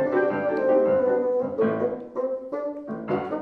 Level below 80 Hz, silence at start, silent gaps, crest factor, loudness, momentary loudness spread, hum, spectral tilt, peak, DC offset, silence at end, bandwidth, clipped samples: -66 dBFS; 0 s; none; 14 dB; -25 LUFS; 11 LU; none; -9 dB/octave; -10 dBFS; under 0.1%; 0 s; 4.7 kHz; under 0.1%